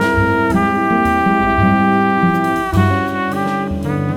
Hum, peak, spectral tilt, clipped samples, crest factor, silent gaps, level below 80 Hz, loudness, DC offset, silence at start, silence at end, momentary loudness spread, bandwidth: none; 0 dBFS; -7.5 dB/octave; under 0.1%; 14 dB; none; -34 dBFS; -15 LUFS; under 0.1%; 0 s; 0 s; 6 LU; 16.5 kHz